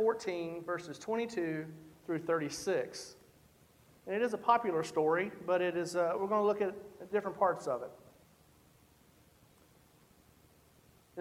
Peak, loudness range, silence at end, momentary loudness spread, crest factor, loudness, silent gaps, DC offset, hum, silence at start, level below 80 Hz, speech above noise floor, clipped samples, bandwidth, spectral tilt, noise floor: -14 dBFS; 7 LU; 0 s; 15 LU; 22 dB; -34 LUFS; none; under 0.1%; none; 0 s; -74 dBFS; 31 dB; under 0.1%; 16 kHz; -5 dB/octave; -65 dBFS